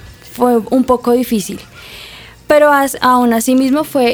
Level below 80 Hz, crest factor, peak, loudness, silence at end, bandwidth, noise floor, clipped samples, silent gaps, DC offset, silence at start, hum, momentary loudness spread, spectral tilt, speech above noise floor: -44 dBFS; 12 dB; 0 dBFS; -12 LUFS; 0 s; over 20 kHz; -35 dBFS; under 0.1%; none; under 0.1%; 0.05 s; none; 21 LU; -4 dB/octave; 24 dB